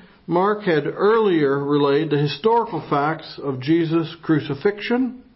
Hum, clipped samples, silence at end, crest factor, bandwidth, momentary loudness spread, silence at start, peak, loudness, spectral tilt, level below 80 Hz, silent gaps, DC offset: none; under 0.1%; 0.15 s; 14 dB; 5.8 kHz; 6 LU; 0.3 s; -6 dBFS; -20 LUFS; -11 dB/octave; -60 dBFS; none; under 0.1%